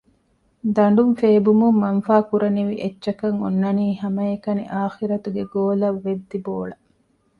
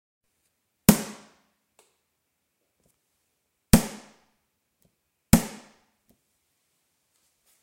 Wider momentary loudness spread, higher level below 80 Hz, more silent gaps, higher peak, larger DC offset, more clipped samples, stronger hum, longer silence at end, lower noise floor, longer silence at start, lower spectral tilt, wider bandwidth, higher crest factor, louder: second, 11 LU vs 20 LU; second, -60 dBFS vs -40 dBFS; neither; about the same, -2 dBFS vs 0 dBFS; neither; neither; neither; second, 0.65 s vs 2.1 s; second, -63 dBFS vs -78 dBFS; second, 0.65 s vs 0.9 s; first, -9.5 dB/octave vs -5 dB/octave; second, 4.9 kHz vs 16 kHz; second, 18 dB vs 30 dB; first, -20 LUFS vs -23 LUFS